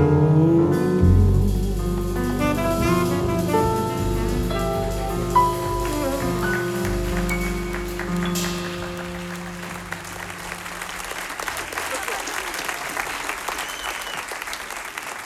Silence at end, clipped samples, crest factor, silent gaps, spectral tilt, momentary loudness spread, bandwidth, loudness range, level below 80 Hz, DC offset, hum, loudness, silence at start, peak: 0 s; under 0.1%; 18 dB; none; -5.5 dB/octave; 13 LU; 16.5 kHz; 8 LU; -32 dBFS; under 0.1%; none; -23 LUFS; 0 s; -4 dBFS